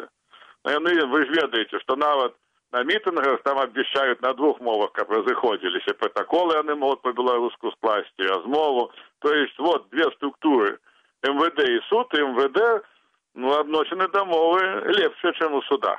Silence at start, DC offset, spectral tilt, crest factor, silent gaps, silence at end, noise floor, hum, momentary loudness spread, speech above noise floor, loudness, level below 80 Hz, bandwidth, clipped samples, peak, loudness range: 0 s; under 0.1%; -4.5 dB/octave; 14 dB; none; 0 s; -53 dBFS; none; 6 LU; 31 dB; -23 LUFS; -74 dBFS; 8.4 kHz; under 0.1%; -8 dBFS; 1 LU